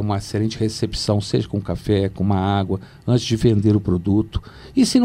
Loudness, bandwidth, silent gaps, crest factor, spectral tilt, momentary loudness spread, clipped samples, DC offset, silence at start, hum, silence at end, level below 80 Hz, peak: -20 LUFS; 14 kHz; none; 16 dB; -6.5 dB/octave; 8 LU; under 0.1%; under 0.1%; 0 s; none; 0 s; -38 dBFS; -2 dBFS